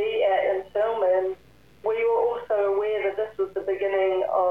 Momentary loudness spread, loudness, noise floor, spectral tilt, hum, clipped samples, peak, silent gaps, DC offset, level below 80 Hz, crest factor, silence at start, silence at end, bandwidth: 6 LU; -25 LUFS; -54 dBFS; -6 dB/octave; none; under 0.1%; -12 dBFS; none; 0.1%; -62 dBFS; 12 dB; 0 s; 0 s; 5.2 kHz